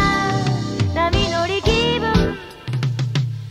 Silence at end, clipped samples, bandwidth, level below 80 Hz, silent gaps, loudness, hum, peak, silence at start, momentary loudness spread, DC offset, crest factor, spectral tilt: 0 s; under 0.1%; 13 kHz; -30 dBFS; none; -20 LUFS; none; -2 dBFS; 0 s; 6 LU; under 0.1%; 16 dB; -5.5 dB/octave